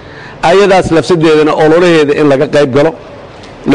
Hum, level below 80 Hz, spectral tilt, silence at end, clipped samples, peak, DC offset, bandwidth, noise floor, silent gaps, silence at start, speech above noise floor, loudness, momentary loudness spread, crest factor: none; -38 dBFS; -6 dB/octave; 0 s; under 0.1%; -2 dBFS; 2%; 10.5 kHz; -29 dBFS; none; 0 s; 22 dB; -8 LUFS; 8 LU; 6 dB